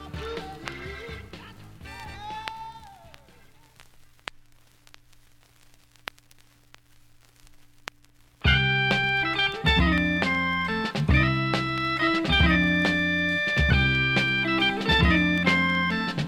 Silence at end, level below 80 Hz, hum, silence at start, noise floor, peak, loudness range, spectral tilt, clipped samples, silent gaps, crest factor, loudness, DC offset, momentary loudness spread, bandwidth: 0 s; -36 dBFS; none; 0 s; -57 dBFS; -6 dBFS; 20 LU; -5.5 dB/octave; under 0.1%; none; 20 dB; -22 LUFS; under 0.1%; 21 LU; 14.5 kHz